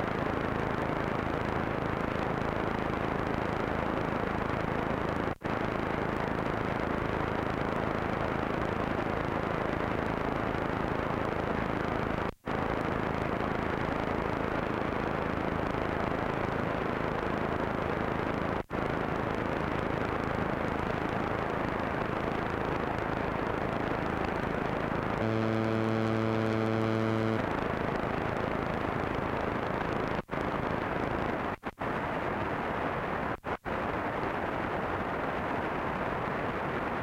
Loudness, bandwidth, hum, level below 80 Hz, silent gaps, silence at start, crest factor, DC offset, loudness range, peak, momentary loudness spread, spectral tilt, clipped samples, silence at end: -32 LUFS; 16.5 kHz; none; -46 dBFS; none; 0 s; 12 dB; under 0.1%; 2 LU; -18 dBFS; 3 LU; -7.5 dB/octave; under 0.1%; 0 s